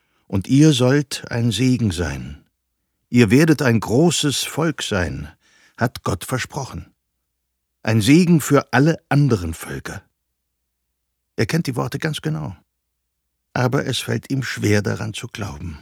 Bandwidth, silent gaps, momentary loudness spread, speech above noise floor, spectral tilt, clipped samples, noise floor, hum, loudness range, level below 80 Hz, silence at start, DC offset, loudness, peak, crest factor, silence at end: 17.5 kHz; none; 16 LU; 57 dB; -5.5 dB/octave; under 0.1%; -75 dBFS; none; 8 LU; -44 dBFS; 0.3 s; under 0.1%; -19 LUFS; 0 dBFS; 20 dB; 0.05 s